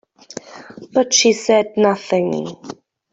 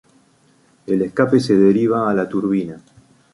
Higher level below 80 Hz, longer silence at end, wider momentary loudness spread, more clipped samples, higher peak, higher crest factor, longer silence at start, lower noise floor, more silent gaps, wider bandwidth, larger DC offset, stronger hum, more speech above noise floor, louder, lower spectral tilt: second, -62 dBFS vs -56 dBFS; second, 0.4 s vs 0.55 s; first, 22 LU vs 9 LU; neither; about the same, -2 dBFS vs -2 dBFS; about the same, 16 dB vs 16 dB; second, 0.35 s vs 0.9 s; second, -38 dBFS vs -56 dBFS; neither; second, 8 kHz vs 11.5 kHz; neither; neither; second, 22 dB vs 39 dB; about the same, -16 LUFS vs -17 LUFS; second, -3 dB/octave vs -7.5 dB/octave